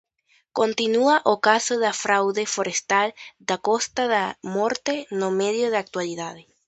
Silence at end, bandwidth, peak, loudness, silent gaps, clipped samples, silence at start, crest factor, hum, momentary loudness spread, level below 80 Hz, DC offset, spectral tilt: 0.25 s; 8.8 kHz; -2 dBFS; -22 LUFS; none; under 0.1%; 0.55 s; 20 dB; none; 10 LU; -70 dBFS; under 0.1%; -2.5 dB/octave